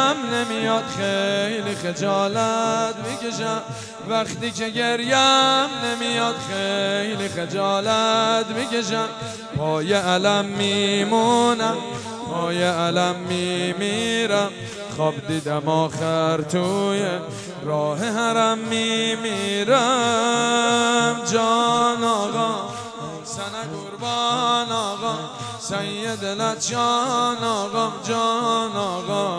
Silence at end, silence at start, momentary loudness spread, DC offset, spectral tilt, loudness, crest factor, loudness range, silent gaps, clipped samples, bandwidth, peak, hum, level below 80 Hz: 0 s; 0 s; 10 LU; under 0.1%; -3.5 dB/octave; -21 LUFS; 18 dB; 4 LU; none; under 0.1%; 11 kHz; -4 dBFS; none; -62 dBFS